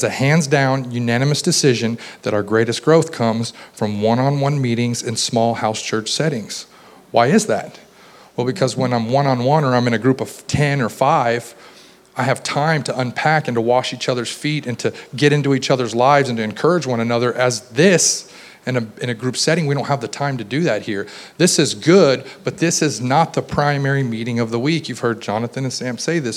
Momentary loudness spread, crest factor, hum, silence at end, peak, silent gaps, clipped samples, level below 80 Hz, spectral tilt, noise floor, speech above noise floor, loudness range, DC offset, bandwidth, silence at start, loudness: 9 LU; 18 dB; none; 0 s; 0 dBFS; none; under 0.1%; -56 dBFS; -4.5 dB/octave; -45 dBFS; 28 dB; 3 LU; under 0.1%; 15 kHz; 0 s; -18 LUFS